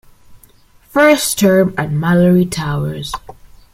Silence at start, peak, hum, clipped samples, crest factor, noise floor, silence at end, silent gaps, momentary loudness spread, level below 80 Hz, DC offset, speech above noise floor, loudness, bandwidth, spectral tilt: 0.3 s; -2 dBFS; none; under 0.1%; 14 dB; -47 dBFS; 0.4 s; none; 12 LU; -42 dBFS; under 0.1%; 34 dB; -14 LUFS; 16.5 kHz; -5.5 dB/octave